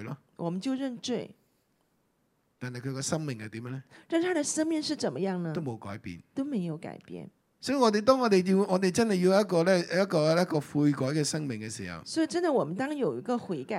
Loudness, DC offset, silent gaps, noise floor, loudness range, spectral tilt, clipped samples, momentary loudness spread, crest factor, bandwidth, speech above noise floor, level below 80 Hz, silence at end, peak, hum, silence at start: -29 LUFS; under 0.1%; none; -73 dBFS; 11 LU; -5.5 dB/octave; under 0.1%; 16 LU; 22 dB; 15.5 kHz; 44 dB; -72 dBFS; 0 s; -8 dBFS; none; 0 s